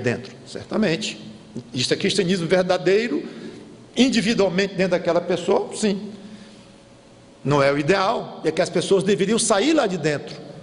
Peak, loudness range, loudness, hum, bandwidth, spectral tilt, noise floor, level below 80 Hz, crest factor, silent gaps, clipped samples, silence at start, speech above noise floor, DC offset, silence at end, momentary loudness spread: -6 dBFS; 3 LU; -21 LUFS; none; 11 kHz; -4.5 dB/octave; -48 dBFS; -56 dBFS; 16 dB; none; under 0.1%; 0 s; 27 dB; under 0.1%; 0 s; 18 LU